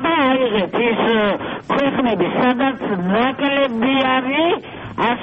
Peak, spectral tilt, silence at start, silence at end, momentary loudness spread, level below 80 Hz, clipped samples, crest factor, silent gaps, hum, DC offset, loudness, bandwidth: -6 dBFS; -7.5 dB/octave; 0 s; 0 s; 5 LU; -50 dBFS; under 0.1%; 12 dB; none; none; under 0.1%; -17 LUFS; 5.8 kHz